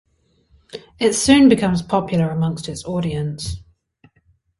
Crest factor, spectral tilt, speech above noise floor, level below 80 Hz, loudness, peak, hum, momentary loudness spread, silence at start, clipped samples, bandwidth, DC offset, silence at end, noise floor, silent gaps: 18 dB; -5 dB/octave; 44 dB; -44 dBFS; -18 LUFS; -2 dBFS; none; 22 LU; 0.75 s; under 0.1%; 11.5 kHz; under 0.1%; 1 s; -61 dBFS; none